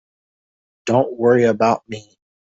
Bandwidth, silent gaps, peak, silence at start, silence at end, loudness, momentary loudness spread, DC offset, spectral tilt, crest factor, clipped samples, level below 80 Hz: 8 kHz; none; -2 dBFS; 0.85 s; 0.55 s; -17 LUFS; 18 LU; under 0.1%; -6.5 dB/octave; 16 dB; under 0.1%; -60 dBFS